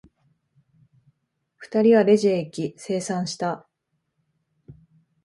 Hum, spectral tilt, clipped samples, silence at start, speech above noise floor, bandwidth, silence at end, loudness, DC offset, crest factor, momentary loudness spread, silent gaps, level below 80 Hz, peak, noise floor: none; -6 dB/octave; under 0.1%; 1.6 s; 55 dB; 11.5 kHz; 0.5 s; -22 LUFS; under 0.1%; 20 dB; 14 LU; none; -68 dBFS; -6 dBFS; -76 dBFS